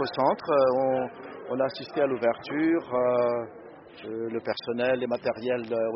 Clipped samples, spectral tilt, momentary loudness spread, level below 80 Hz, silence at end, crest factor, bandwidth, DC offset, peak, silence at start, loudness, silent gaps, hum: under 0.1%; -4 dB/octave; 13 LU; -68 dBFS; 0 s; 18 dB; 5.8 kHz; under 0.1%; -10 dBFS; 0 s; -27 LUFS; none; none